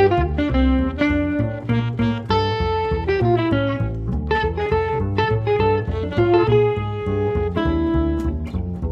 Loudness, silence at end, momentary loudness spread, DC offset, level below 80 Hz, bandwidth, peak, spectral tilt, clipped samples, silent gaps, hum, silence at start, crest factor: -20 LUFS; 0 s; 6 LU; under 0.1%; -28 dBFS; 7.2 kHz; -4 dBFS; -8.5 dB/octave; under 0.1%; none; none; 0 s; 14 dB